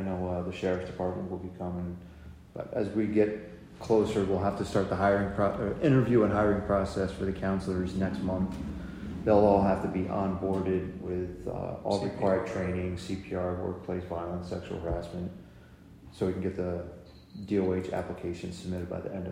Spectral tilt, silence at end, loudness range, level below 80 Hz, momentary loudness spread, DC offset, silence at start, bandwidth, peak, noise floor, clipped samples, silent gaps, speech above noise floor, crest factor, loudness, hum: -8 dB/octave; 0 s; 8 LU; -50 dBFS; 13 LU; under 0.1%; 0 s; 11 kHz; -10 dBFS; -52 dBFS; under 0.1%; none; 23 dB; 20 dB; -30 LUFS; none